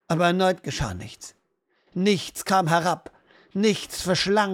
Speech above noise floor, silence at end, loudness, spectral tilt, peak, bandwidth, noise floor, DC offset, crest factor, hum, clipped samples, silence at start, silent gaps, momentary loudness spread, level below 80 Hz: 47 dB; 0 s; -24 LUFS; -4.5 dB/octave; -6 dBFS; 17 kHz; -70 dBFS; under 0.1%; 18 dB; none; under 0.1%; 0.1 s; none; 16 LU; -50 dBFS